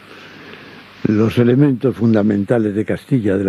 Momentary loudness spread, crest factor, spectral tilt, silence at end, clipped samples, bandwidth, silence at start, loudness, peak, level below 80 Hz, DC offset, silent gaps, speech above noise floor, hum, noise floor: 23 LU; 14 dB; -9 dB/octave; 0 s; under 0.1%; 12.5 kHz; 0.1 s; -16 LUFS; -2 dBFS; -54 dBFS; under 0.1%; none; 24 dB; none; -38 dBFS